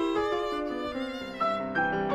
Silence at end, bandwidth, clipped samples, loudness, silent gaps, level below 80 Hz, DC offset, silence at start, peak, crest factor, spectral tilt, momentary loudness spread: 0 s; 14 kHz; under 0.1%; -30 LUFS; none; -54 dBFS; under 0.1%; 0 s; -16 dBFS; 14 dB; -5.5 dB/octave; 6 LU